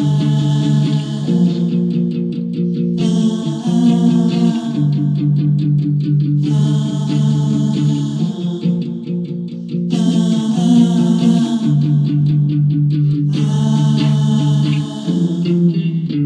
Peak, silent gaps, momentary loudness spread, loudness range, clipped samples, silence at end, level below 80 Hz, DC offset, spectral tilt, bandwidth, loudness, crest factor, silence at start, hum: -2 dBFS; none; 6 LU; 3 LU; under 0.1%; 0 s; -54 dBFS; under 0.1%; -8 dB/octave; 9.4 kHz; -15 LUFS; 14 dB; 0 s; none